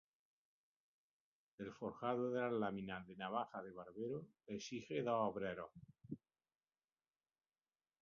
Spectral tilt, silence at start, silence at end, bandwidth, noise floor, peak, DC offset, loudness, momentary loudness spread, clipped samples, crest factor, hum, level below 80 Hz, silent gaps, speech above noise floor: -5 dB/octave; 1.6 s; 1.85 s; 7 kHz; under -90 dBFS; -26 dBFS; under 0.1%; -45 LUFS; 15 LU; under 0.1%; 20 dB; none; -80 dBFS; none; over 46 dB